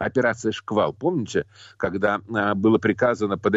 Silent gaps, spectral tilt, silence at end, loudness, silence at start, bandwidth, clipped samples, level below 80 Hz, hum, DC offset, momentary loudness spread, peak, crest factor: none; -6 dB/octave; 0 s; -23 LUFS; 0 s; 8 kHz; under 0.1%; -58 dBFS; none; under 0.1%; 8 LU; -8 dBFS; 14 dB